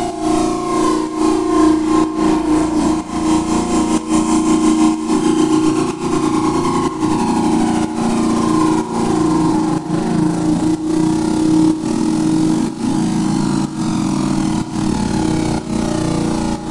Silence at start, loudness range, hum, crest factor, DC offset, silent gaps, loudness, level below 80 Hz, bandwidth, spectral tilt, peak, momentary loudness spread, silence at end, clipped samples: 0 s; 2 LU; none; 14 dB; under 0.1%; none; -16 LUFS; -36 dBFS; 11.5 kHz; -6 dB/octave; -2 dBFS; 5 LU; 0 s; under 0.1%